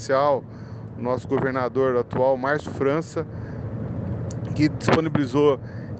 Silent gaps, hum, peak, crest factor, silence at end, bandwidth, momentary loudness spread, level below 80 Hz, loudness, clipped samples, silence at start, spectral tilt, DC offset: none; none; -4 dBFS; 20 dB; 0 s; 8.8 kHz; 12 LU; -48 dBFS; -24 LUFS; under 0.1%; 0 s; -7 dB/octave; under 0.1%